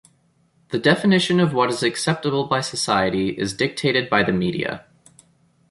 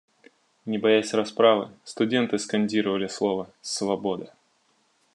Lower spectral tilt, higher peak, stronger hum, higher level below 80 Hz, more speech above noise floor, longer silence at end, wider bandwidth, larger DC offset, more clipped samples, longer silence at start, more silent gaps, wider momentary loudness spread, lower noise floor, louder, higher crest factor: about the same, -5 dB/octave vs -4.5 dB/octave; first, -2 dBFS vs -6 dBFS; neither; first, -54 dBFS vs -76 dBFS; about the same, 41 dB vs 43 dB; about the same, 0.9 s vs 0.9 s; about the same, 11.5 kHz vs 11 kHz; neither; neither; about the same, 0.7 s vs 0.65 s; neither; second, 7 LU vs 12 LU; second, -61 dBFS vs -67 dBFS; first, -20 LUFS vs -25 LUFS; about the same, 18 dB vs 20 dB